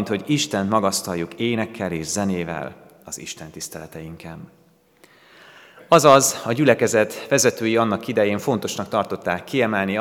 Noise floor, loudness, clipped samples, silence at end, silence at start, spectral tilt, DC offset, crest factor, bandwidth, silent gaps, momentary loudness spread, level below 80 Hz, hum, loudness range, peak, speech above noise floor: -55 dBFS; -20 LUFS; under 0.1%; 0 s; 0 s; -4 dB/octave; under 0.1%; 22 dB; 19 kHz; none; 19 LU; -62 dBFS; none; 14 LU; 0 dBFS; 34 dB